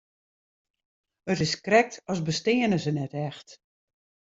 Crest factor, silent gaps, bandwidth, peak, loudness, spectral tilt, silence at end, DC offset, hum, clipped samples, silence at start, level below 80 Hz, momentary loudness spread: 22 dB; none; 8 kHz; -6 dBFS; -26 LUFS; -5 dB/octave; 0.8 s; under 0.1%; none; under 0.1%; 1.25 s; -64 dBFS; 13 LU